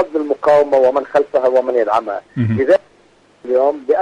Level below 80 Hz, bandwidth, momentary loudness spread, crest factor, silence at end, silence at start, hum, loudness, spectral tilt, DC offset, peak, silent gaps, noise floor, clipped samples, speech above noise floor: -56 dBFS; 9.2 kHz; 7 LU; 12 dB; 0 s; 0 s; none; -15 LUFS; -8 dB/octave; under 0.1%; -4 dBFS; none; -51 dBFS; under 0.1%; 36 dB